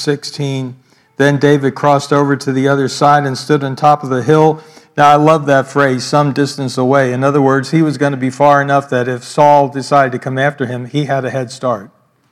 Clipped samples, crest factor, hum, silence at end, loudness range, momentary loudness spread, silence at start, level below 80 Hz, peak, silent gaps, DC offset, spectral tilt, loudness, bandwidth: 0.4%; 12 dB; none; 0.45 s; 2 LU; 9 LU; 0 s; -60 dBFS; 0 dBFS; none; under 0.1%; -6 dB/octave; -13 LUFS; 13 kHz